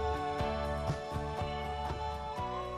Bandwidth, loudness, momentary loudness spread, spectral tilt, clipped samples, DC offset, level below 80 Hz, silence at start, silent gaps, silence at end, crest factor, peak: 13.5 kHz; -37 LUFS; 3 LU; -6 dB/octave; under 0.1%; under 0.1%; -44 dBFS; 0 s; none; 0 s; 14 dB; -22 dBFS